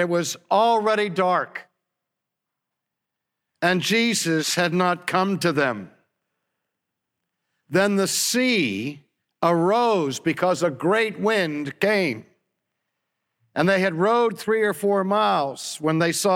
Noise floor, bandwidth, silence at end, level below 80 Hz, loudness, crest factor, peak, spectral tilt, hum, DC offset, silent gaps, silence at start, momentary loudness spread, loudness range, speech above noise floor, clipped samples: -84 dBFS; 17 kHz; 0 s; -74 dBFS; -21 LUFS; 18 dB; -6 dBFS; -4 dB/octave; none; under 0.1%; none; 0 s; 6 LU; 4 LU; 62 dB; under 0.1%